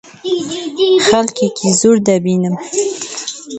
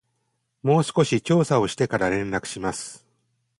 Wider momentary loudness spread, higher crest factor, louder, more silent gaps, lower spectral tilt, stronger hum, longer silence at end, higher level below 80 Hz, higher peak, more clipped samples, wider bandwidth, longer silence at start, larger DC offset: about the same, 11 LU vs 9 LU; about the same, 14 dB vs 18 dB; first, -14 LUFS vs -23 LUFS; neither; second, -4 dB/octave vs -5.5 dB/octave; neither; second, 0 s vs 0.6 s; about the same, -54 dBFS vs -54 dBFS; first, 0 dBFS vs -6 dBFS; neither; second, 9 kHz vs 11.5 kHz; second, 0.05 s vs 0.65 s; neither